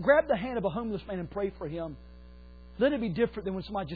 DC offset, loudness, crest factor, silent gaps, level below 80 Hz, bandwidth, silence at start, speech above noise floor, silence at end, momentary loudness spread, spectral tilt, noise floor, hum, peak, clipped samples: under 0.1%; -31 LUFS; 18 dB; none; -50 dBFS; 4.9 kHz; 0 s; 20 dB; 0 s; 12 LU; -5 dB/octave; -49 dBFS; none; -12 dBFS; under 0.1%